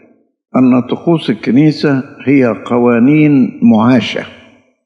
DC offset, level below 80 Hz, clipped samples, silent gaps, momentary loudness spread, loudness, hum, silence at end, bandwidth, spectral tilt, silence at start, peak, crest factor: under 0.1%; -60 dBFS; under 0.1%; none; 8 LU; -11 LUFS; none; 0.55 s; 7 kHz; -8 dB/octave; 0.55 s; 0 dBFS; 10 dB